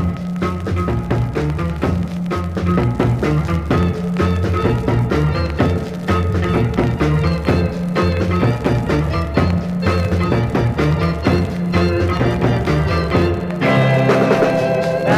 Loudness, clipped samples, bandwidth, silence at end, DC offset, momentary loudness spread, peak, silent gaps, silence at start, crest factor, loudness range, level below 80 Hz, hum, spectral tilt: -17 LUFS; under 0.1%; 14 kHz; 0 s; 0.2%; 5 LU; 0 dBFS; none; 0 s; 16 dB; 3 LU; -28 dBFS; none; -7.5 dB/octave